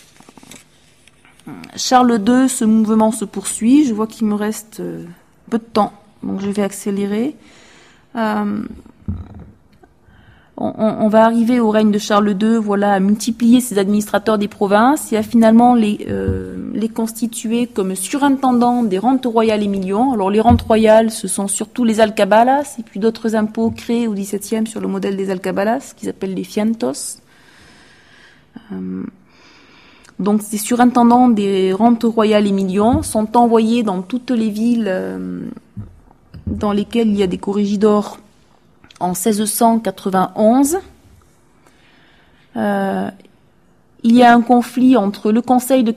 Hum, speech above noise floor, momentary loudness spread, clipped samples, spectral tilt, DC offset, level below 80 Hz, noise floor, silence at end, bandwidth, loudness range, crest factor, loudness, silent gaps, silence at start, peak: none; 39 dB; 14 LU; under 0.1%; -5.5 dB/octave; under 0.1%; -44 dBFS; -54 dBFS; 0 s; 15 kHz; 9 LU; 16 dB; -15 LUFS; none; 0.55 s; 0 dBFS